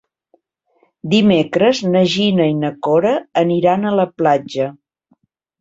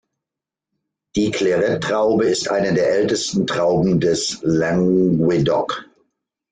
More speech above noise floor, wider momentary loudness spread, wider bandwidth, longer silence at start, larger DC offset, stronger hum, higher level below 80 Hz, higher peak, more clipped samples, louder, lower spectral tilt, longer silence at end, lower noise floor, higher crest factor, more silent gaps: second, 46 dB vs 69 dB; about the same, 6 LU vs 5 LU; second, 7.8 kHz vs 9.6 kHz; about the same, 1.05 s vs 1.15 s; neither; neither; second, -56 dBFS vs -50 dBFS; first, -2 dBFS vs -6 dBFS; neither; first, -15 LUFS vs -18 LUFS; about the same, -6.5 dB/octave vs -5.5 dB/octave; first, 0.9 s vs 0.7 s; second, -61 dBFS vs -86 dBFS; about the same, 14 dB vs 14 dB; neither